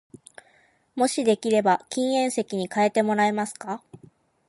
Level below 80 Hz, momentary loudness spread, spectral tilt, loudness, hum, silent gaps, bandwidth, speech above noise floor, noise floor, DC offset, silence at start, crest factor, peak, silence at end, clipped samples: -74 dBFS; 13 LU; -4.5 dB/octave; -24 LUFS; none; none; 11.5 kHz; 38 dB; -61 dBFS; under 0.1%; 0.95 s; 18 dB; -8 dBFS; 0.5 s; under 0.1%